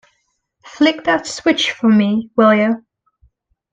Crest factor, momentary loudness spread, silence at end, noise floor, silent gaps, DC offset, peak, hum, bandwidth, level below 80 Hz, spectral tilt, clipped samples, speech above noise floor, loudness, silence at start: 16 dB; 6 LU; 0.95 s; -67 dBFS; none; under 0.1%; 0 dBFS; none; 9.2 kHz; -58 dBFS; -5 dB/octave; under 0.1%; 53 dB; -15 LUFS; 0.65 s